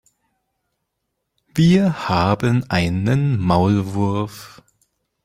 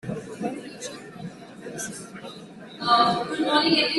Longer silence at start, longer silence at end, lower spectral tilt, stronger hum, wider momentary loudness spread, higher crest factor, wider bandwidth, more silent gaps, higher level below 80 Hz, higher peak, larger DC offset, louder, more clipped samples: first, 1.55 s vs 0.05 s; first, 0.75 s vs 0 s; first, -7 dB/octave vs -3.5 dB/octave; neither; second, 10 LU vs 21 LU; about the same, 18 dB vs 20 dB; first, 15 kHz vs 12.5 kHz; neither; first, -46 dBFS vs -64 dBFS; first, -2 dBFS vs -8 dBFS; neither; first, -18 LUFS vs -24 LUFS; neither